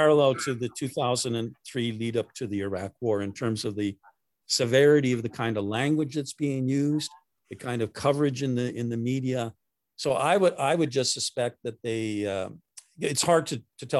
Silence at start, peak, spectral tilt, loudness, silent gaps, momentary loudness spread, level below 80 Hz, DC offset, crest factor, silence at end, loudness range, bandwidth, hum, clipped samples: 0 s; -8 dBFS; -5 dB/octave; -27 LUFS; none; 11 LU; -62 dBFS; under 0.1%; 20 dB; 0 s; 4 LU; 13 kHz; none; under 0.1%